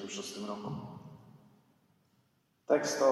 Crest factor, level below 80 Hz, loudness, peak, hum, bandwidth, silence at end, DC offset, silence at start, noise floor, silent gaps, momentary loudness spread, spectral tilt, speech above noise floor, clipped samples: 22 dB; -78 dBFS; -34 LUFS; -14 dBFS; none; 13 kHz; 0 s; under 0.1%; 0 s; -73 dBFS; none; 24 LU; -4 dB/octave; 41 dB; under 0.1%